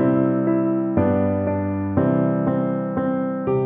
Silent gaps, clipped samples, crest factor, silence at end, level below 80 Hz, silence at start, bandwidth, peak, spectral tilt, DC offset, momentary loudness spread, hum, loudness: none; under 0.1%; 14 dB; 0 s; -50 dBFS; 0 s; 3.7 kHz; -6 dBFS; -13 dB/octave; under 0.1%; 4 LU; none; -21 LUFS